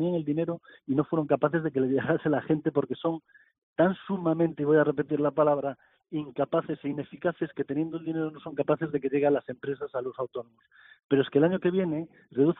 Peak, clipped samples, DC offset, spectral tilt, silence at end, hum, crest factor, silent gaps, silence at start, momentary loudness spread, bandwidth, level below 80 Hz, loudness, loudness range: -10 dBFS; under 0.1%; under 0.1%; -7 dB/octave; 0.05 s; none; 18 dB; 3.58-3.74 s, 11.04-11.09 s; 0 s; 11 LU; 4 kHz; -68 dBFS; -28 LUFS; 4 LU